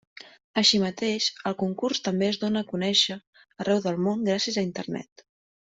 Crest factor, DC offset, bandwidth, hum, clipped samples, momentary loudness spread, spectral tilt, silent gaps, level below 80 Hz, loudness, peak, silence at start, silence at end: 20 dB; under 0.1%; 8.2 kHz; none; under 0.1%; 11 LU; -4 dB/octave; 0.44-0.54 s, 3.27-3.33 s; -66 dBFS; -25 LUFS; -8 dBFS; 0.25 s; 0.6 s